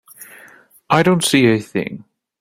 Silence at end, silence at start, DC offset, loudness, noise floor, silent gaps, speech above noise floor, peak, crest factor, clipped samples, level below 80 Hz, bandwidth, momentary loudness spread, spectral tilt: 0.45 s; 0.2 s; under 0.1%; -15 LUFS; -46 dBFS; none; 31 dB; -2 dBFS; 16 dB; under 0.1%; -54 dBFS; 16 kHz; 20 LU; -4.5 dB/octave